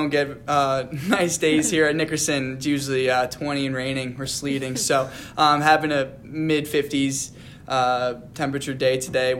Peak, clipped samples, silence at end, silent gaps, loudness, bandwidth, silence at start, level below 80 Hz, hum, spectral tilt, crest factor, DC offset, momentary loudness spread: -4 dBFS; under 0.1%; 0 s; none; -22 LUFS; 16.5 kHz; 0 s; -54 dBFS; none; -4 dB/octave; 18 dB; under 0.1%; 9 LU